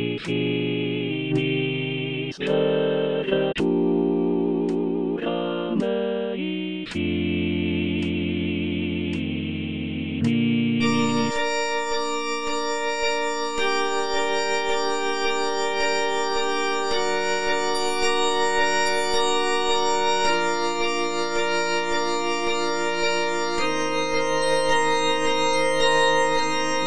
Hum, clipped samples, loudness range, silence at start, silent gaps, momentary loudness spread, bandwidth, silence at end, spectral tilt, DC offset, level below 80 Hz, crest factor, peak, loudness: none; under 0.1%; 4 LU; 0 s; none; 5 LU; 10.5 kHz; 0 s; -4 dB/octave; under 0.1%; -52 dBFS; 14 dB; -8 dBFS; -23 LUFS